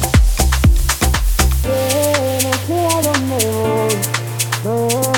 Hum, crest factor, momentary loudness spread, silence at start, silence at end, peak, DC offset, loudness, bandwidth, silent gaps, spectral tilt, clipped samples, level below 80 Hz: none; 14 dB; 4 LU; 0 s; 0 s; 0 dBFS; under 0.1%; -16 LUFS; 19.5 kHz; none; -4 dB/octave; under 0.1%; -20 dBFS